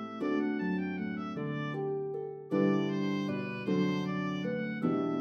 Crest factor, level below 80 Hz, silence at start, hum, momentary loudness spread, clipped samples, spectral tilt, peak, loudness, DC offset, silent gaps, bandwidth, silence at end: 16 dB; -80 dBFS; 0 s; none; 7 LU; under 0.1%; -8 dB/octave; -16 dBFS; -33 LUFS; under 0.1%; none; 6.8 kHz; 0 s